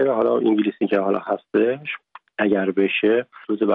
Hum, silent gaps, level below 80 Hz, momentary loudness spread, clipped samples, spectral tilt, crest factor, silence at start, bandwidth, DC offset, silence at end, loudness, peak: none; none; -70 dBFS; 10 LU; under 0.1%; -9 dB/octave; 14 dB; 0 s; 4.1 kHz; under 0.1%; 0 s; -21 LUFS; -6 dBFS